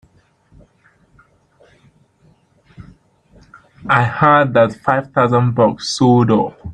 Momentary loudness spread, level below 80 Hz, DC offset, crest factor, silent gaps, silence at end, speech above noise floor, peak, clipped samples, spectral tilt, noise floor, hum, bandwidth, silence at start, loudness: 5 LU; -50 dBFS; under 0.1%; 16 dB; none; 0 s; 41 dB; -2 dBFS; under 0.1%; -6.5 dB/octave; -55 dBFS; none; 9.8 kHz; 2.8 s; -14 LUFS